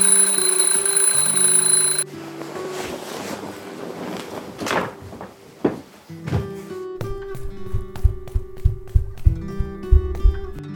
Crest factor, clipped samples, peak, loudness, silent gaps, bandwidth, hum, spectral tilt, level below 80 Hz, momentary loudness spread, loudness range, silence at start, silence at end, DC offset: 20 dB; under 0.1%; 0 dBFS; -19 LUFS; none; 19.5 kHz; none; -3 dB/octave; -26 dBFS; 20 LU; 12 LU; 0 s; 0 s; under 0.1%